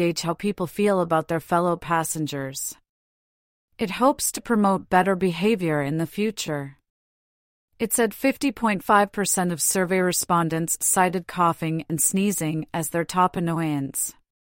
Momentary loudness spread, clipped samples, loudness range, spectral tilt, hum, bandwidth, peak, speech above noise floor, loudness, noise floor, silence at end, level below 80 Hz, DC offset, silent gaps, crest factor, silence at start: 8 LU; under 0.1%; 4 LU; -4.5 dB/octave; none; 16.5 kHz; -6 dBFS; over 67 dB; -23 LUFS; under -90 dBFS; 0.4 s; -58 dBFS; under 0.1%; 2.89-3.68 s, 6.90-7.68 s; 18 dB; 0 s